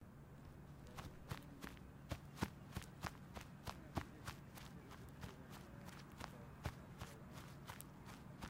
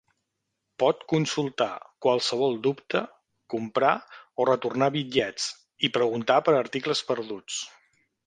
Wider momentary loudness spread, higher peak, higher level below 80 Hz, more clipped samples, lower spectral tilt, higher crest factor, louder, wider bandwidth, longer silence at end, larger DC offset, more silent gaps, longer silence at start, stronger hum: about the same, 8 LU vs 9 LU; second, -26 dBFS vs -6 dBFS; first, -64 dBFS vs -70 dBFS; neither; about the same, -5 dB/octave vs -4.5 dB/octave; first, 28 dB vs 20 dB; second, -54 LUFS vs -26 LUFS; first, 16 kHz vs 10 kHz; second, 0 s vs 0.55 s; neither; neither; second, 0 s vs 0.8 s; neither